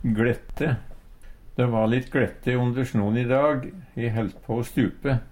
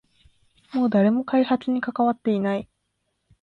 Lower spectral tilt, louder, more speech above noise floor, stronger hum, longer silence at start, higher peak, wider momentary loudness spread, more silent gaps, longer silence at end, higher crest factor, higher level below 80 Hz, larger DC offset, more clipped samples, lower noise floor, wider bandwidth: about the same, -8 dB/octave vs -9 dB/octave; about the same, -25 LUFS vs -23 LUFS; second, 20 dB vs 53 dB; neither; second, 0 s vs 0.75 s; about the same, -8 dBFS vs -10 dBFS; about the same, 8 LU vs 7 LU; neither; second, 0 s vs 0.8 s; about the same, 16 dB vs 14 dB; first, -42 dBFS vs -64 dBFS; neither; neither; second, -44 dBFS vs -75 dBFS; first, 16.5 kHz vs 5.6 kHz